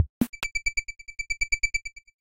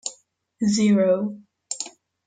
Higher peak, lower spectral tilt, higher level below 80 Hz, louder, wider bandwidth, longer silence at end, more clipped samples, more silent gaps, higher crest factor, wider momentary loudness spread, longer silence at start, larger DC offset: about the same, -10 dBFS vs -10 dBFS; second, -2.5 dB/octave vs -5 dB/octave; first, -42 dBFS vs -64 dBFS; second, -28 LUFS vs -22 LUFS; first, 16.5 kHz vs 9.4 kHz; second, 0.05 s vs 0.4 s; neither; first, 0.09-0.21 s, 0.29-0.33 s vs none; first, 20 dB vs 14 dB; second, 12 LU vs 16 LU; about the same, 0 s vs 0.05 s; first, 0.7% vs under 0.1%